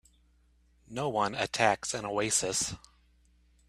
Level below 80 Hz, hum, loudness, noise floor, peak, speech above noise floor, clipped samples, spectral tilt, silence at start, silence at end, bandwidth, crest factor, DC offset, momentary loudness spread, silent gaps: -62 dBFS; none; -30 LUFS; -66 dBFS; -8 dBFS; 35 dB; under 0.1%; -2.5 dB/octave; 0.9 s; 0.9 s; 15.5 kHz; 26 dB; under 0.1%; 8 LU; none